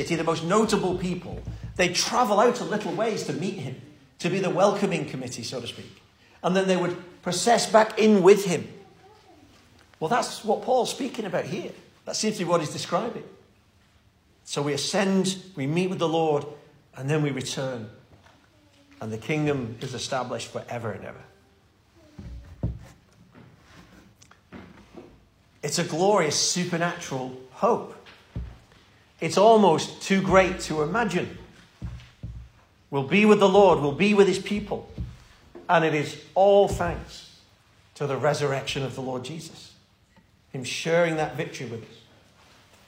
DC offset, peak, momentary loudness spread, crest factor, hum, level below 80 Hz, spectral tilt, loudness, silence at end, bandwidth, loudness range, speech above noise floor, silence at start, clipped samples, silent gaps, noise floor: under 0.1%; -4 dBFS; 21 LU; 22 dB; none; -50 dBFS; -4.5 dB/octave; -24 LUFS; 0.95 s; 16 kHz; 10 LU; 37 dB; 0 s; under 0.1%; none; -60 dBFS